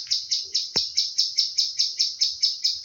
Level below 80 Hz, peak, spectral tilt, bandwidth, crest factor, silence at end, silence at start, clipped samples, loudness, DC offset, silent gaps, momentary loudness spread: -68 dBFS; -8 dBFS; 2 dB/octave; 17 kHz; 18 dB; 0 s; 0 s; under 0.1%; -22 LUFS; under 0.1%; none; 2 LU